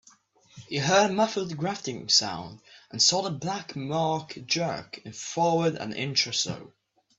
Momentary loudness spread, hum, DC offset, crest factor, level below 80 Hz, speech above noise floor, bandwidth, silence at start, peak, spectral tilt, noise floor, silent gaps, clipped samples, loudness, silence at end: 15 LU; none; under 0.1%; 20 dB; -66 dBFS; 32 dB; 8.4 kHz; 0.55 s; -8 dBFS; -3 dB/octave; -59 dBFS; none; under 0.1%; -26 LUFS; 0.5 s